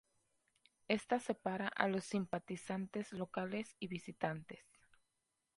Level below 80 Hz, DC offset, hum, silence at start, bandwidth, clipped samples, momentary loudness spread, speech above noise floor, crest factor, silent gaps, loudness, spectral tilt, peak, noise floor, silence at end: -78 dBFS; under 0.1%; none; 0.9 s; 11.5 kHz; under 0.1%; 9 LU; 46 dB; 28 dB; none; -41 LUFS; -5.5 dB/octave; -16 dBFS; -87 dBFS; 0.95 s